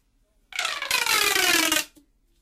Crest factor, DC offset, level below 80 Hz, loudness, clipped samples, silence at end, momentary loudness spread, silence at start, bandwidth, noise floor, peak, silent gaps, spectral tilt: 16 dB; under 0.1%; -58 dBFS; -21 LUFS; under 0.1%; 0.55 s; 12 LU; 0.5 s; 16 kHz; -65 dBFS; -10 dBFS; none; 0.5 dB/octave